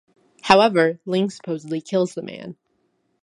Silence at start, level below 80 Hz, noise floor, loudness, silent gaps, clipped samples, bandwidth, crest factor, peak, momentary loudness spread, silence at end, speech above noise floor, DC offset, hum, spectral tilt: 0.45 s; -60 dBFS; -68 dBFS; -20 LUFS; none; under 0.1%; 11.5 kHz; 22 dB; 0 dBFS; 20 LU; 0.7 s; 48 dB; under 0.1%; none; -5.5 dB/octave